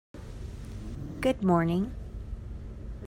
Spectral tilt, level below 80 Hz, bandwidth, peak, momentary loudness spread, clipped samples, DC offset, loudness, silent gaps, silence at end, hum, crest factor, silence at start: -7.5 dB/octave; -42 dBFS; 16 kHz; -14 dBFS; 17 LU; under 0.1%; under 0.1%; -30 LUFS; none; 0 s; none; 18 dB; 0.15 s